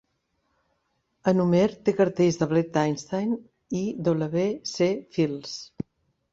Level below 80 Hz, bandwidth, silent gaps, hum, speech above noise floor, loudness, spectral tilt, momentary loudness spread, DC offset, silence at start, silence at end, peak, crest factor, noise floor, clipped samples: -62 dBFS; 7.8 kHz; none; none; 50 dB; -25 LUFS; -6.5 dB/octave; 13 LU; under 0.1%; 1.25 s; 0.5 s; -8 dBFS; 18 dB; -74 dBFS; under 0.1%